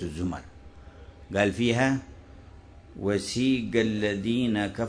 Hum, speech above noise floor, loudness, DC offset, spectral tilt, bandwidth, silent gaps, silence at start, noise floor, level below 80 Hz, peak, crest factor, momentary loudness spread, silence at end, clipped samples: none; 22 dB; -27 LUFS; under 0.1%; -5.5 dB/octave; 11 kHz; none; 0 s; -49 dBFS; -50 dBFS; -8 dBFS; 20 dB; 10 LU; 0 s; under 0.1%